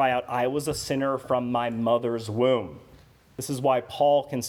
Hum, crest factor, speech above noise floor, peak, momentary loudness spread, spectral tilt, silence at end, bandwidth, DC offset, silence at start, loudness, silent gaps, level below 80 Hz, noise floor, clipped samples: none; 16 dB; 29 dB; -10 dBFS; 8 LU; -5 dB/octave; 0 s; 18 kHz; under 0.1%; 0 s; -25 LUFS; none; -58 dBFS; -54 dBFS; under 0.1%